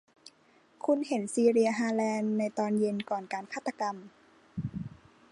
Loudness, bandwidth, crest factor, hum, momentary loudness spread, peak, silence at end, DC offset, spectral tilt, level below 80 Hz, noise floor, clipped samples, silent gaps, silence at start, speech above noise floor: -30 LUFS; 11.5 kHz; 18 dB; none; 14 LU; -14 dBFS; 0.45 s; under 0.1%; -6 dB/octave; -66 dBFS; -64 dBFS; under 0.1%; none; 0.85 s; 34 dB